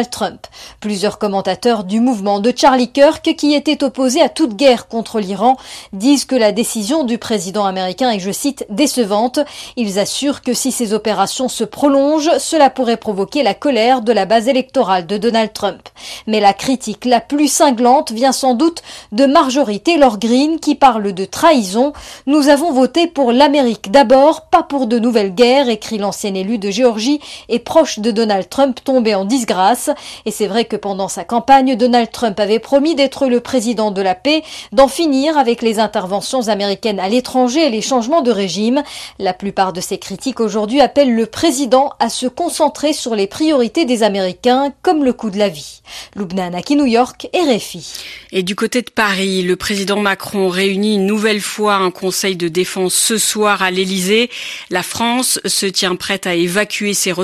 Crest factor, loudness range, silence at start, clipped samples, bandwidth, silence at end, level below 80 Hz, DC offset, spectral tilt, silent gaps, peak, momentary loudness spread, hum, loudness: 14 dB; 4 LU; 0 s; under 0.1%; 14 kHz; 0 s; -50 dBFS; under 0.1%; -3.5 dB/octave; none; 0 dBFS; 8 LU; none; -14 LUFS